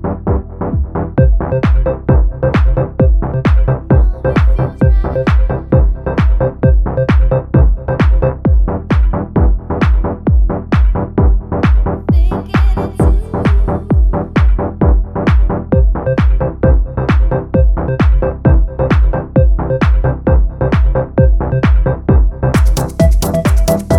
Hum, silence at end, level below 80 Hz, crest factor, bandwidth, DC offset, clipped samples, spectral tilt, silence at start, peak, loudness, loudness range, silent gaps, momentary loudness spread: none; 0 s; -12 dBFS; 10 dB; 13 kHz; under 0.1%; under 0.1%; -8 dB/octave; 0 s; 0 dBFS; -13 LUFS; 1 LU; none; 2 LU